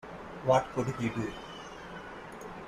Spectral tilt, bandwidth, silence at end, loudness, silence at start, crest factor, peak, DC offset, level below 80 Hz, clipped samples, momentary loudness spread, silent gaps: -6 dB/octave; 14 kHz; 0 s; -31 LUFS; 0.05 s; 22 dB; -12 dBFS; under 0.1%; -58 dBFS; under 0.1%; 16 LU; none